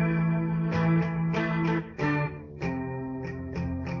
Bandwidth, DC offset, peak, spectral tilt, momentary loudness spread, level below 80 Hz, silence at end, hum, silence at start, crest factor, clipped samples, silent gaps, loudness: 6.4 kHz; under 0.1%; -14 dBFS; -7.5 dB/octave; 9 LU; -48 dBFS; 0 s; none; 0 s; 14 dB; under 0.1%; none; -29 LUFS